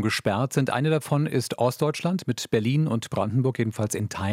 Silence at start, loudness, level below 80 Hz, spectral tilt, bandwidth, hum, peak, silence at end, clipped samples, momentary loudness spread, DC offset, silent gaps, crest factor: 0 s; -25 LUFS; -64 dBFS; -6 dB/octave; 16 kHz; none; -8 dBFS; 0 s; under 0.1%; 4 LU; under 0.1%; none; 16 dB